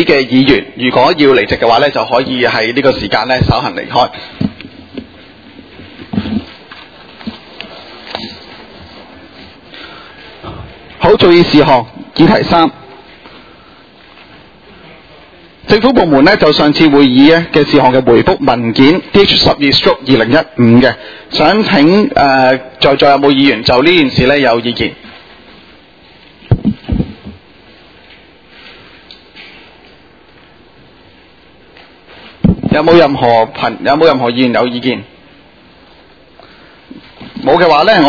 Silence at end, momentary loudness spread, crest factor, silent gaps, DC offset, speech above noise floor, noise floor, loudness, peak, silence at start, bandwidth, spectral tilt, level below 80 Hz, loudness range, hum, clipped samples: 0 s; 22 LU; 12 dB; none; under 0.1%; 34 dB; -42 dBFS; -9 LUFS; 0 dBFS; 0 s; 5.4 kHz; -7 dB/octave; -34 dBFS; 17 LU; none; 1%